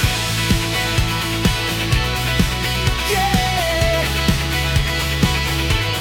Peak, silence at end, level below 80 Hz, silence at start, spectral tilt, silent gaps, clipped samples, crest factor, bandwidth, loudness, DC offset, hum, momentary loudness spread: -4 dBFS; 0 s; -26 dBFS; 0 s; -4 dB/octave; none; under 0.1%; 14 dB; 18 kHz; -18 LUFS; under 0.1%; none; 2 LU